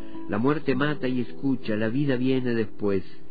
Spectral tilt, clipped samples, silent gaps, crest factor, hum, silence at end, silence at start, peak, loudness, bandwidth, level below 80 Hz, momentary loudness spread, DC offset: -10 dB/octave; under 0.1%; none; 14 dB; none; 0.15 s; 0 s; -10 dBFS; -26 LUFS; 5 kHz; -54 dBFS; 4 LU; 4%